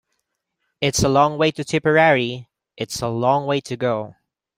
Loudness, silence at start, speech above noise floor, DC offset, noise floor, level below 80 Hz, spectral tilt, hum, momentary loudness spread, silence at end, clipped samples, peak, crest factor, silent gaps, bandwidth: -19 LUFS; 0.8 s; 56 dB; under 0.1%; -75 dBFS; -48 dBFS; -4.5 dB/octave; none; 13 LU; 0.45 s; under 0.1%; -2 dBFS; 18 dB; none; 16 kHz